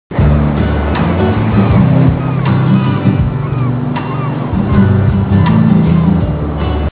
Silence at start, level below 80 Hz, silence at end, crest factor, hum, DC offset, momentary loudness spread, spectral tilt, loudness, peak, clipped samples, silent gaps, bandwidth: 0.1 s; -20 dBFS; 0.05 s; 10 dB; none; 0.4%; 7 LU; -12.5 dB/octave; -12 LUFS; 0 dBFS; 0.2%; none; 4 kHz